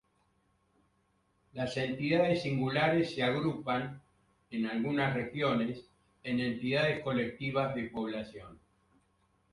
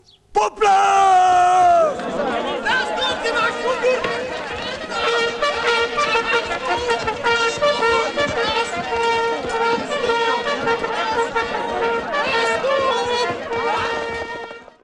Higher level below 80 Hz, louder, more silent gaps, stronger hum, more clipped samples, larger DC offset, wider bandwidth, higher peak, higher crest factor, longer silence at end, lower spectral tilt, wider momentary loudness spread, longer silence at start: second, -64 dBFS vs -48 dBFS; second, -32 LUFS vs -19 LUFS; neither; neither; neither; neither; about the same, 11.5 kHz vs 11 kHz; second, -16 dBFS vs -8 dBFS; first, 18 dB vs 12 dB; first, 0.95 s vs 0.2 s; first, -7 dB/octave vs -2.5 dB/octave; first, 13 LU vs 9 LU; first, 1.55 s vs 0.35 s